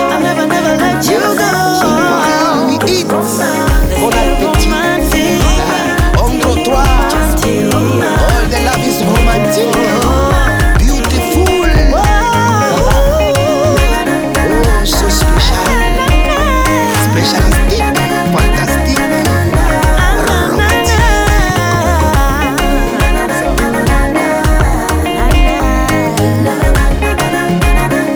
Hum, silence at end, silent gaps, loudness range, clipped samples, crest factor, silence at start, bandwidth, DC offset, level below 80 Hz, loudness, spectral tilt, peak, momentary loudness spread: none; 0 s; none; 1 LU; under 0.1%; 10 dB; 0 s; over 20 kHz; under 0.1%; -14 dBFS; -11 LUFS; -5 dB/octave; 0 dBFS; 2 LU